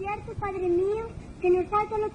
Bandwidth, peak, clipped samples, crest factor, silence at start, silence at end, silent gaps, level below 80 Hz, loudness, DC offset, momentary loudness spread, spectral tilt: 8.8 kHz; -14 dBFS; under 0.1%; 12 dB; 0 s; 0 s; none; -48 dBFS; -27 LUFS; under 0.1%; 9 LU; -8 dB/octave